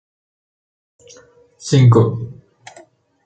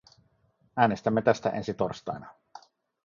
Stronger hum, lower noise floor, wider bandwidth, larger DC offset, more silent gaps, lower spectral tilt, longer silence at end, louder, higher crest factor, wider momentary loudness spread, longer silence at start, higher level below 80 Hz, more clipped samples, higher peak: neither; second, -47 dBFS vs -68 dBFS; first, 8.8 kHz vs 7.4 kHz; neither; neither; about the same, -7 dB/octave vs -6.5 dB/octave; first, 0.95 s vs 0.5 s; first, -13 LUFS vs -28 LUFS; second, 16 dB vs 22 dB; first, 21 LU vs 14 LU; first, 1.65 s vs 0.75 s; first, -54 dBFS vs -62 dBFS; neither; first, -2 dBFS vs -6 dBFS